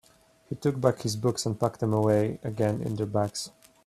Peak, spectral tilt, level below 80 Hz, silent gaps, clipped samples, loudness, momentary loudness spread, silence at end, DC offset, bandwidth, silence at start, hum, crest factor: -8 dBFS; -6 dB/octave; -60 dBFS; none; under 0.1%; -28 LUFS; 7 LU; 0.35 s; under 0.1%; 14.5 kHz; 0.5 s; none; 20 dB